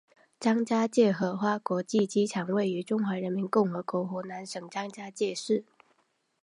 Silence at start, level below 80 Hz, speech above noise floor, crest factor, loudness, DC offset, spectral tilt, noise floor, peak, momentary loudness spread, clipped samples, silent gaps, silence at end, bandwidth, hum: 0.4 s; -80 dBFS; 44 dB; 18 dB; -29 LUFS; under 0.1%; -6 dB/octave; -72 dBFS; -10 dBFS; 11 LU; under 0.1%; none; 0.8 s; 11 kHz; none